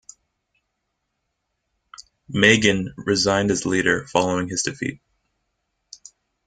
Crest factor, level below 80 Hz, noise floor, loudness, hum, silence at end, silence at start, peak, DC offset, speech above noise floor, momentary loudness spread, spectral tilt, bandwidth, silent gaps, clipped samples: 24 dB; -54 dBFS; -77 dBFS; -20 LUFS; none; 1.5 s; 2 s; 0 dBFS; under 0.1%; 56 dB; 11 LU; -3.5 dB/octave; 9.6 kHz; none; under 0.1%